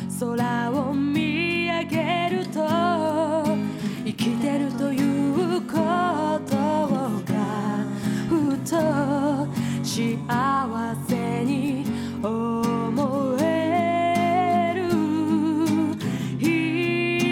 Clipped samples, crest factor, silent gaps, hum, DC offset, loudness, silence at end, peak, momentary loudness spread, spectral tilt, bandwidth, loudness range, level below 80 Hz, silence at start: under 0.1%; 14 dB; none; none; under 0.1%; -24 LUFS; 0 s; -10 dBFS; 4 LU; -6 dB/octave; 16.5 kHz; 2 LU; -62 dBFS; 0 s